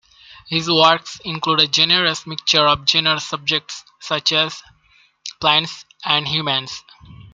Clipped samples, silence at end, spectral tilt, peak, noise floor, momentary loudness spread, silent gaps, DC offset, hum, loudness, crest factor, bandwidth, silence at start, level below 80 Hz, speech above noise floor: under 0.1%; 0.1 s; -2.5 dB/octave; 0 dBFS; -56 dBFS; 18 LU; none; under 0.1%; none; -16 LUFS; 20 dB; 13 kHz; 0.3 s; -56 dBFS; 37 dB